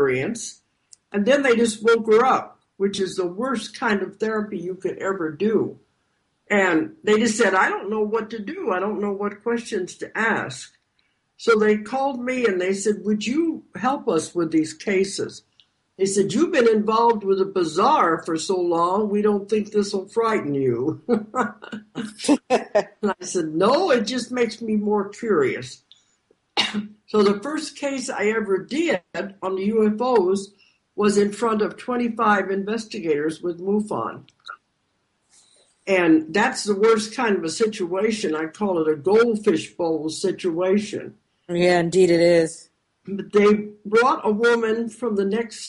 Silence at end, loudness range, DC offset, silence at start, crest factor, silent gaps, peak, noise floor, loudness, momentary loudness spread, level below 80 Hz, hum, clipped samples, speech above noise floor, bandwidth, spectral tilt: 0 s; 4 LU; under 0.1%; 0 s; 16 dB; none; -6 dBFS; -70 dBFS; -22 LUFS; 11 LU; -64 dBFS; none; under 0.1%; 49 dB; 11.5 kHz; -5 dB/octave